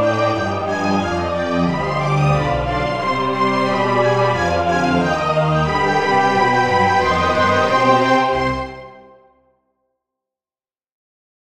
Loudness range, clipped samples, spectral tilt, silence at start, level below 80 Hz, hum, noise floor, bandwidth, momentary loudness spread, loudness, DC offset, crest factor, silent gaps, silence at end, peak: 4 LU; under 0.1%; -6 dB/octave; 0 s; -40 dBFS; none; under -90 dBFS; 12.5 kHz; 5 LU; -17 LUFS; 0.7%; 16 dB; none; 2.35 s; -2 dBFS